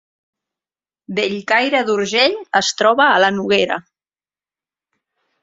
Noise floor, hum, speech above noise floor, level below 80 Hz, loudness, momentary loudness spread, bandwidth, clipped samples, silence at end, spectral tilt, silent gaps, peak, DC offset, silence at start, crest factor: under -90 dBFS; none; over 74 dB; -64 dBFS; -16 LUFS; 9 LU; 8 kHz; under 0.1%; 1.65 s; -3 dB/octave; none; 0 dBFS; under 0.1%; 1.1 s; 18 dB